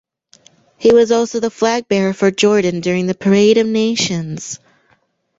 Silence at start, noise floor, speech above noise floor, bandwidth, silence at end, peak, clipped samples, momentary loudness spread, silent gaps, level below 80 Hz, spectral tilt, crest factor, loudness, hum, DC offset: 0.8 s; -59 dBFS; 45 dB; 8 kHz; 0.85 s; -2 dBFS; under 0.1%; 11 LU; none; -54 dBFS; -5 dB/octave; 14 dB; -15 LUFS; none; under 0.1%